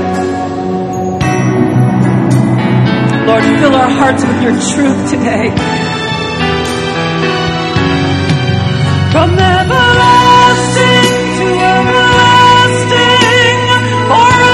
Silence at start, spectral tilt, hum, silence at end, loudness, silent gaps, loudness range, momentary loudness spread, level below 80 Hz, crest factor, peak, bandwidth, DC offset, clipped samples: 0 s; -5 dB/octave; none; 0 s; -9 LUFS; none; 6 LU; 8 LU; -30 dBFS; 8 dB; 0 dBFS; 12.5 kHz; under 0.1%; 0.9%